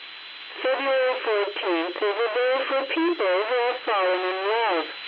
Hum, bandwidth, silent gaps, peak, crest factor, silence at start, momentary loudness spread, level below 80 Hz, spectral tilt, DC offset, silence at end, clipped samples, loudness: none; 5.4 kHz; none; -12 dBFS; 12 dB; 0 s; 4 LU; -88 dBFS; -4.5 dB/octave; under 0.1%; 0 s; under 0.1%; -24 LUFS